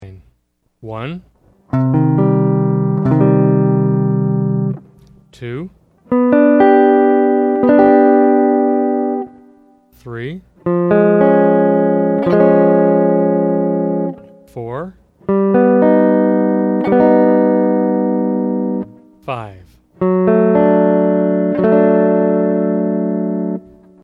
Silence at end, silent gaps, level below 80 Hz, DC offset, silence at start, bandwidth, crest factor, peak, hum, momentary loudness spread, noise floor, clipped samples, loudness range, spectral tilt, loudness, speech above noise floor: 0.45 s; none; -52 dBFS; under 0.1%; 0 s; 4.6 kHz; 14 dB; 0 dBFS; none; 16 LU; -63 dBFS; under 0.1%; 4 LU; -11 dB/octave; -13 LUFS; 49 dB